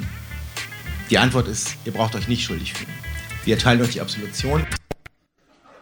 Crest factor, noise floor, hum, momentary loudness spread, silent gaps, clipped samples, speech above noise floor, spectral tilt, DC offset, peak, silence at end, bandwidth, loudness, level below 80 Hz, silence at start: 24 dB; -61 dBFS; none; 15 LU; none; under 0.1%; 40 dB; -4.5 dB/octave; under 0.1%; 0 dBFS; 0.85 s; over 20 kHz; -22 LUFS; -36 dBFS; 0 s